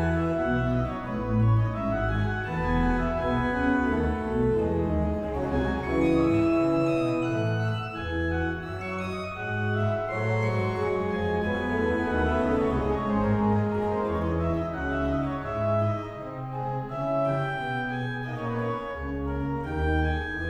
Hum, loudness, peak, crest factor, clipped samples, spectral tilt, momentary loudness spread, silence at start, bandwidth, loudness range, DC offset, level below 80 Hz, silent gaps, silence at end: none; -27 LUFS; -12 dBFS; 14 dB; under 0.1%; -8.5 dB/octave; 7 LU; 0 s; 9.2 kHz; 4 LU; under 0.1%; -38 dBFS; none; 0 s